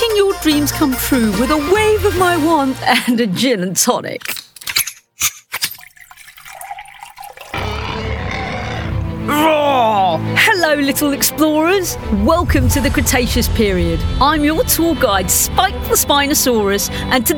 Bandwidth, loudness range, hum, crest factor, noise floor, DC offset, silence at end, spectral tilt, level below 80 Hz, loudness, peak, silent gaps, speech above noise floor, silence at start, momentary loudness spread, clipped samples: over 20 kHz; 9 LU; none; 14 dB; -40 dBFS; under 0.1%; 0 s; -3.5 dB/octave; -28 dBFS; -15 LUFS; 0 dBFS; none; 26 dB; 0 s; 10 LU; under 0.1%